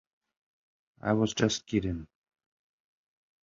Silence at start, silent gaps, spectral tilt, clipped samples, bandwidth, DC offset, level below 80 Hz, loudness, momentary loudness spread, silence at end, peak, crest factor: 1.05 s; none; -5 dB/octave; under 0.1%; 7.8 kHz; under 0.1%; -54 dBFS; -30 LUFS; 10 LU; 1.4 s; -10 dBFS; 22 dB